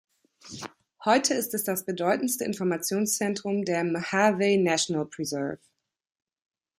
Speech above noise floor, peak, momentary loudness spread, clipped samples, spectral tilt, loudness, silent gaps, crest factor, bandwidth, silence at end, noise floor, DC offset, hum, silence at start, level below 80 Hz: 21 dB; -8 dBFS; 16 LU; under 0.1%; -4 dB/octave; -26 LUFS; none; 20 dB; 16 kHz; 1.25 s; -47 dBFS; under 0.1%; none; 0.45 s; -72 dBFS